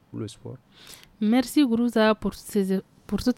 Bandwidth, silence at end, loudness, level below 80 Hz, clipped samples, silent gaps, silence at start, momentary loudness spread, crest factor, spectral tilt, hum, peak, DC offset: 16.5 kHz; 0.05 s; -24 LUFS; -50 dBFS; under 0.1%; none; 0.15 s; 18 LU; 16 dB; -5.5 dB/octave; none; -10 dBFS; under 0.1%